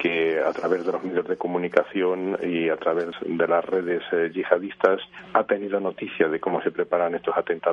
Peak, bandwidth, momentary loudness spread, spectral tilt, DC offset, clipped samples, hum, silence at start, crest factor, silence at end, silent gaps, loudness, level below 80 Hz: -2 dBFS; 7 kHz; 5 LU; -7 dB/octave; under 0.1%; under 0.1%; none; 0 s; 22 dB; 0 s; none; -24 LUFS; -68 dBFS